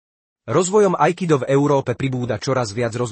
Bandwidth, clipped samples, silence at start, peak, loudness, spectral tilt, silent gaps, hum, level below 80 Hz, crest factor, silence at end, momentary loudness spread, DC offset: 8.8 kHz; under 0.1%; 0.45 s; -2 dBFS; -19 LUFS; -6 dB/octave; none; none; -56 dBFS; 16 dB; 0 s; 7 LU; under 0.1%